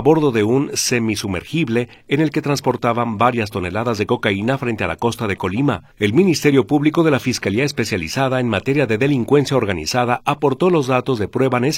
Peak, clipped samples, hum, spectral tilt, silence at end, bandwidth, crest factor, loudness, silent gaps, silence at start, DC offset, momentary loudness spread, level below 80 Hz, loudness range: 0 dBFS; under 0.1%; none; -5.5 dB/octave; 0 s; 16.5 kHz; 16 dB; -18 LUFS; none; 0 s; under 0.1%; 6 LU; -48 dBFS; 2 LU